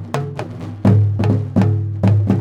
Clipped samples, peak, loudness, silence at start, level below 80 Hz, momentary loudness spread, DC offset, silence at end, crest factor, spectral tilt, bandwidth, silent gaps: under 0.1%; -2 dBFS; -17 LUFS; 0 s; -46 dBFS; 12 LU; under 0.1%; 0 s; 14 dB; -9 dB/octave; 7.6 kHz; none